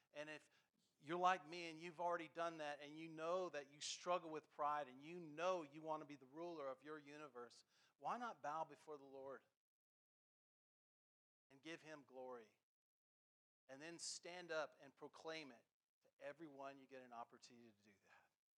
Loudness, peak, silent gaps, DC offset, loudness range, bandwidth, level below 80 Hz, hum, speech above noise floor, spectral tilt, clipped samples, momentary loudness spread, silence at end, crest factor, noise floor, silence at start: -51 LUFS; -28 dBFS; 7.95-7.99 s, 9.57-11.50 s, 12.63-13.68 s, 15.72-16.02 s, 16.13-16.17 s; under 0.1%; 15 LU; 11.5 kHz; under -90 dBFS; none; 28 dB; -3.5 dB/octave; under 0.1%; 15 LU; 0.4 s; 26 dB; -79 dBFS; 0.15 s